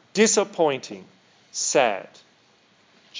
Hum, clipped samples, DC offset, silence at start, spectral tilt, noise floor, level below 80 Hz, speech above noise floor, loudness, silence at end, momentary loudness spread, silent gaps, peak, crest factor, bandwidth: none; under 0.1%; under 0.1%; 0.15 s; -2.5 dB/octave; -59 dBFS; -84 dBFS; 37 dB; -22 LUFS; 0 s; 17 LU; none; -4 dBFS; 22 dB; 7.8 kHz